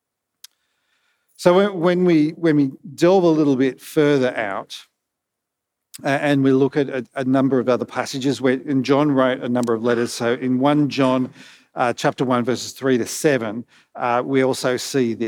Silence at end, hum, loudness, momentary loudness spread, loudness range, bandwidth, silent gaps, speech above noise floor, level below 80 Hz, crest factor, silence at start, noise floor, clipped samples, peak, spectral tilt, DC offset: 0 s; none; -19 LUFS; 8 LU; 4 LU; 18 kHz; none; 62 dB; -74 dBFS; 18 dB; 1.4 s; -81 dBFS; under 0.1%; -2 dBFS; -6 dB/octave; under 0.1%